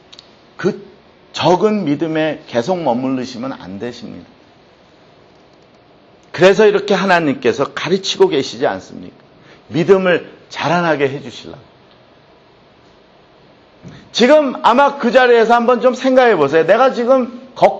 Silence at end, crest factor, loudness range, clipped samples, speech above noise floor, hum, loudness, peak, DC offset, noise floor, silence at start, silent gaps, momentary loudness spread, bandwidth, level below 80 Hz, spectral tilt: 0 s; 16 dB; 11 LU; under 0.1%; 34 dB; none; -14 LUFS; 0 dBFS; under 0.1%; -47 dBFS; 0.6 s; none; 17 LU; 8.2 kHz; -58 dBFS; -5.5 dB/octave